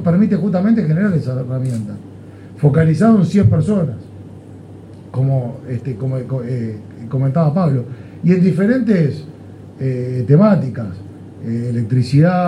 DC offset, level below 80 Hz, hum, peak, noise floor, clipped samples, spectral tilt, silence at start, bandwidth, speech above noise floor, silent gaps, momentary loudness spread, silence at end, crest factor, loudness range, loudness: under 0.1%; -50 dBFS; none; 0 dBFS; -36 dBFS; under 0.1%; -9.5 dB/octave; 0 s; 10.5 kHz; 21 dB; none; 23 LU; 0 s; 14 dB; 5 LU; -16 LUFS